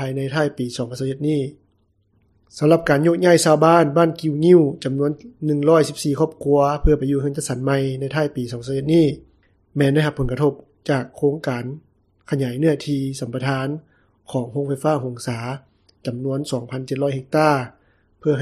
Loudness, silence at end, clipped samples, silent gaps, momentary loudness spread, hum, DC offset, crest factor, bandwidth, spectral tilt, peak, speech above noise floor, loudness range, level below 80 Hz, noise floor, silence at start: -20 LUFS; 0 s; under 0.1%; none; 13 LU; none; under 0.1%; 20 dB; 14 kHz; -6.5 dB/octave; 0 dBFS; 44 dB; 8 LU; -38 dBFS; -63 dBFS; 0 s